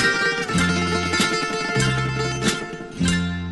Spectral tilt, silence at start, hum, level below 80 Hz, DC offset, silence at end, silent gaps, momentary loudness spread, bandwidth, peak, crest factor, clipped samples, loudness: -4 dB/octave; 0 s; none; -40 dBFS; 0.2%; 0 s; none; 4 LU; 12 kHz; -6 dBFS; 16 dB; under 0.1%; -21 LUFS